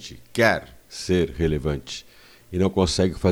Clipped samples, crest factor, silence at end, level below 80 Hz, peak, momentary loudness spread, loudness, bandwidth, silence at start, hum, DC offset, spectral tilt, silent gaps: under 0.1%; 20 dB; 0 s; -40 dBFS; -2 dBFS; 14 LU; -23 LUFS; 16.5 kHz; 0 s; none; under 0.1%; -5.5 dB/octave; none